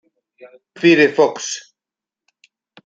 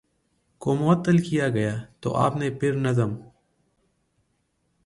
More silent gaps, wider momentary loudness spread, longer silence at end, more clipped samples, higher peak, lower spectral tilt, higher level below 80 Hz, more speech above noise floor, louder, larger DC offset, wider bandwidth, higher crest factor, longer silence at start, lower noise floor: neither; first, 14 LU vs 9 LU; second, 1.25 s vs 1.6 s; neither; first, -2 dBFS vs -8 dBFS; second, -4 dB/octave vs -7.5 dB/octave; second, -66 dBFS vs -58 dBFS; first, 72 dB vs 49 dB; first, -15 LUFS vs -24 LUFS; neither; second, 8 kHz vs 11.5 kHz; about the same, 18 dB vs 18 dB; second, 0.45 s vs 0.6 s; first, -88 dBFS vs -71 dBFS